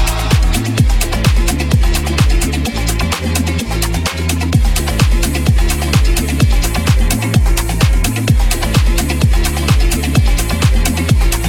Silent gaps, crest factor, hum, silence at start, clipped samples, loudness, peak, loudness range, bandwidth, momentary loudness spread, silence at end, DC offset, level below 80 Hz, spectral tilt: none; 12 dB; none; 0 s; under 0.1%; -14 LUFS; 0 dBFS; 2 LU; 17.5 kHz; 3 LU; 0 s; under 0.1%; -14 dBFS; -4.5 dB/octave